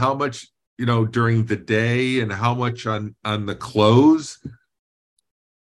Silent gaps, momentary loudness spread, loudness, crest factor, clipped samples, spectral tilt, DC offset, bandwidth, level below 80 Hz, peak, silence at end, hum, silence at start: 0.67-0.77 s; 12 LU; -20 LUFS; 18 dB; under 0.1%; -6.5 dB/octave; under 0.1%; 11 kHz; -58 dBFS; -4 dBFS; 1.1 s; none; 0 s